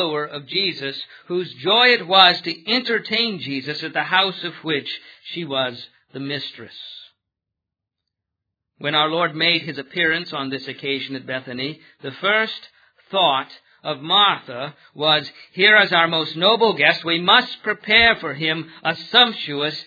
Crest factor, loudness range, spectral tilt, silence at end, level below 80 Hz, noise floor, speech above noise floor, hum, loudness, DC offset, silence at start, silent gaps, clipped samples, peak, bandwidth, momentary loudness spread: 20 dB; 12 LU; -5 dB/octave; 0.05 s; -58 dBFS; -84 dBFS; 64 dB; none; -18 LUFS; under 0.1%; 0 s; none; under 0.1%; 0 dBFS; 5 kHz; 18 LU